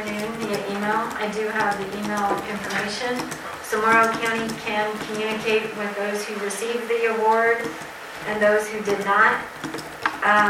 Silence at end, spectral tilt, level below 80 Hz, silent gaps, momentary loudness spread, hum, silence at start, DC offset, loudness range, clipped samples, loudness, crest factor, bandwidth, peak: 0 s; -3.5 dB/octave; -58 dBFS; none; 11 LU; none; 0 s; under 0.1%; 4 LU; under 0.1%; -23 LUFS; 18 dB; 16.5 kHz; -4 dBFS